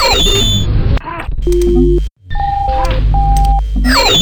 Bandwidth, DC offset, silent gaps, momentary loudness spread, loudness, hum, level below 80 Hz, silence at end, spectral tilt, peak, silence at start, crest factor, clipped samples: 19.5 kHz; under 0.1%; none; 9 LU; -13 LUFS; none; -14 dBFS; 0 s; -4.5 dB/octave; 0 dBFS; 0 s; 10 dB; under 0.1%